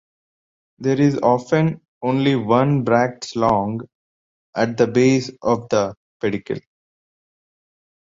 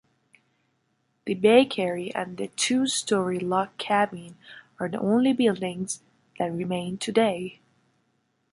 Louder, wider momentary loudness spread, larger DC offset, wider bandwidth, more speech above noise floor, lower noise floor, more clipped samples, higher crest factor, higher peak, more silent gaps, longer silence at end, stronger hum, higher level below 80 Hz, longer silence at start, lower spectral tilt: first, -19 LUFS vs -25 LUFS; second, 11 LU vs 14 LU; neither; second, 7.8 kHz vs 11.5 kHz; first, over 72 dB vs 47 dB; first, under -90 dBFS vs -72 dBFS; neither; about the same, 18 dB vs 22 dB; about the same, -2 dBFS vs -4 dBFS; first, 1.88-2.01 s, 3.95-4.53 s, 5.97-6.20 s vs none; first, 1.5 s vs 1 s; neither; first, -56 dBFS vs -70 dBFS; second, 0.8 s vs 1.25 s; first, -6.5 dB/octave vs -4.5 dB/octave